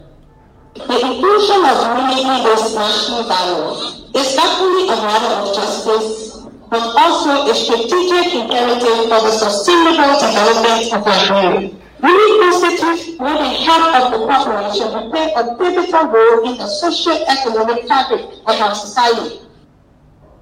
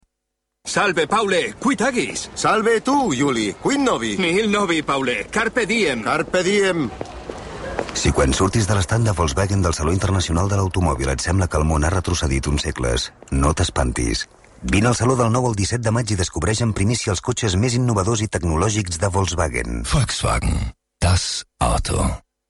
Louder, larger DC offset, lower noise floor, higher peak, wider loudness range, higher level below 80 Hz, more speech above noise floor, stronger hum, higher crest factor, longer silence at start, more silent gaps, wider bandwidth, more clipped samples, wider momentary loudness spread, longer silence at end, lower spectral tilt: first, -13 LUFS vs -20 LUFS; neither; second, -47 dBFS vs -78 dBFS; first, 0 dBFS vs -4 dBFS; about the same, 4 LU vs 2 LU; second, -50 dBFS vs -30 dBFS; second, 34 dB vs 59 dB; neither; about the same, 14 dB vs 14 dB; about the same, 0.75 s vs 0.65 s; neither; first, 16 kHz vs 11.5 kHz; neither; first, 9 LU vs 6 LU; first, 1 s vs 0.3 s; second, -3 dB/octave vs -4.5 dB/octave